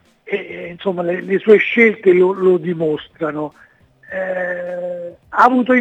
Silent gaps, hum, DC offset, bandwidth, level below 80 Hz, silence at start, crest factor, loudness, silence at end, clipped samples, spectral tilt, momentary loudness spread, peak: none; none; under 0.1%; 7.4 kHz; -62 dBFS; 0.25 s; 16 dB; -16 LUFS; 0 s; under 0.1%; -7.5 dB/octave; 15 LU; 0 dBFS